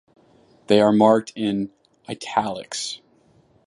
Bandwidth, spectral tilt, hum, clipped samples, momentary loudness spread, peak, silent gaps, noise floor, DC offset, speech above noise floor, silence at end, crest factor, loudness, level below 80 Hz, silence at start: 11.5 kHz; -5 dB/octave; none; under 0.1%; 18 LU; -2 dBFS; none; -58 dBFS; under 0.1%; 38 dB; 0.7 s; 20 dB; -21 LUFS; -62 dBFS; 0.7 s